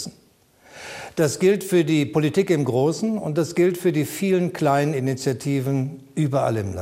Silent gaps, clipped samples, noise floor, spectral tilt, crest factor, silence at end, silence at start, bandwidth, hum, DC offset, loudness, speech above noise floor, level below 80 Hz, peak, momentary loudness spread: none; under 0.1%; -57 dBFS; -6.5 dB/octave; 14 dB; 0 s; 0 s; 16 kHz; none; under 0.1%; -22 LUFS; 36 dB; -62 dBFS; -6 dBFS; 7 LU